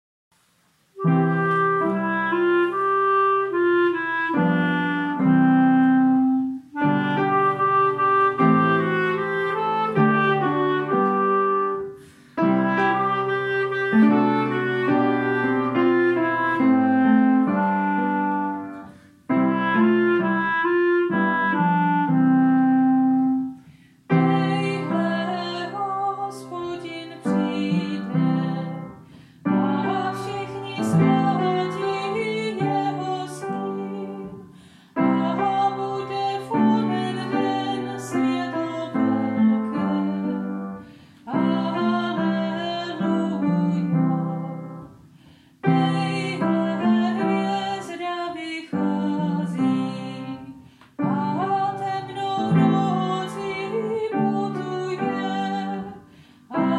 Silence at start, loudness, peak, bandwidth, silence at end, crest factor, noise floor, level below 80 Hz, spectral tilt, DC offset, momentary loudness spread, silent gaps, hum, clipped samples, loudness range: 0.95 s; -22 LUFS; -6 dBFS; 11 kHz; 0 s; 16 dB; -63 dBFS; -68 dBFS; -7.5 dB/octave; under 0.1%; 11 LU; none; none; under 0.1%; 6 LU